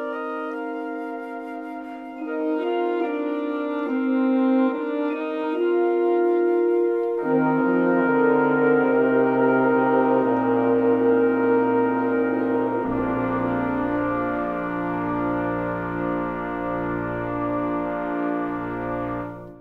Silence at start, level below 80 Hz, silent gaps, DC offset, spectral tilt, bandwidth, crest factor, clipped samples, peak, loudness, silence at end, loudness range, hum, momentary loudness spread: 0 s; -52 dBFS; none; under 0.1%; -9.5 dB/octave; 4.4 kHz; 16 dB; under 0.1%; -6 dBFS; -22 LUFS; 0 s; 7 LU; none; 10 LU